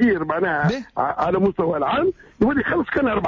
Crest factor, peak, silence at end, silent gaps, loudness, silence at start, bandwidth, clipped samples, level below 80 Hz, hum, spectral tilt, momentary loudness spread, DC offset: 12 dB; -8 dBFS; 0 s; none; -21 LUFS; 0 s; 7.2 kHz; under 0.1%; -46 dBFS; none; -8 dB/octave; 4 LU; under 0.1%